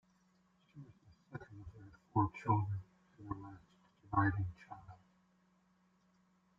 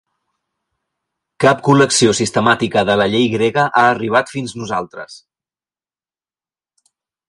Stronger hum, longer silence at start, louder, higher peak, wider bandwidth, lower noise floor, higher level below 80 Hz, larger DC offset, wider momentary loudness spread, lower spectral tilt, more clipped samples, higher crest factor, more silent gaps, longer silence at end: neither; second, 0.75 s vs 1.4 s; second, -38 LUFS vs -15 LUFS; second, -20 dBFS vs 0 dBFS; second, 7 kHz vs 11.5 kHz; second, -74 dBFS vs under -90 dBFS; second, -66 dBFS vs -54 dBFS; neither; first, 24 LU vs 13 LU; first, -8.5 dB/octave vs -4 dB/octave; neither; first, 24 dB vs 18 dB; neither; second, 1.65 s vs 2.1 s